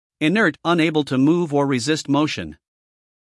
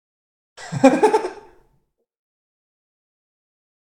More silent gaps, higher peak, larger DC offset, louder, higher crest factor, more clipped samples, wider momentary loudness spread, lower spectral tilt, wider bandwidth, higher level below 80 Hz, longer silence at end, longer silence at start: neither; second, -6 dBFS vs 0 dBFS; neither; about the same, -19 LUFS vs -17 LUFS; second, 16 dB vs 24 dB; neither; second, 5 LU vs 18 LU; about the same, -5.5 dB/octave vs -6 dB/octave; second, 12 kHz vs 18 kHz; about the same, -60 dBFS vs -62 dBFS; second, 0.85 s vs 2.6 s; second, 0.2 s vs 0.6 s